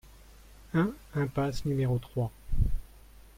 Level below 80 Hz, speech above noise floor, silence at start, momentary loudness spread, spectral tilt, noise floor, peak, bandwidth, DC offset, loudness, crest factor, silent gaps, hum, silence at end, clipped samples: -36 dBFS; 23 dB; 0.75 s; 5 LU; -7.5 dB/octave; -53 dBFS; -12 dBFS; 16 kHz; under 0.1%; -32 LUFS; 18 dB; none; none; 0.55 s; under 0.1%